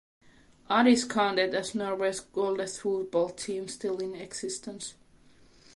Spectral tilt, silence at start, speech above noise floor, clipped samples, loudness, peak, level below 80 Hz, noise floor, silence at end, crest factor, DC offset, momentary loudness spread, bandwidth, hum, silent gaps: -3.5 dB/octave; 0.7 s; 29 dB; under 0.1%; -29 LUFS; -10 dBFS; -66 dBFS; -58 dBFS; 0.85 s; 20 dB; under 0.1%; 13 LU; 11.5 kHz; none; none